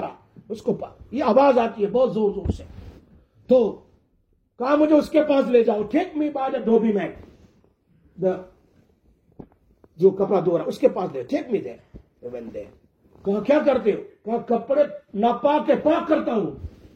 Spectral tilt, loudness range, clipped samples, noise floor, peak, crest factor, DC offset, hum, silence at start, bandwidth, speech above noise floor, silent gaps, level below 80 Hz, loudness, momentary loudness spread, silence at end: -7.5 dB/octave; 5 LU; under 0.1%; -65 dBFS; -4 dBFS; 18 dB; under 0.1%; none; 0 s; 9 kHz; 44 dB; none; -50 dBFS; -22 LUFS; 16 LU; 0.25 s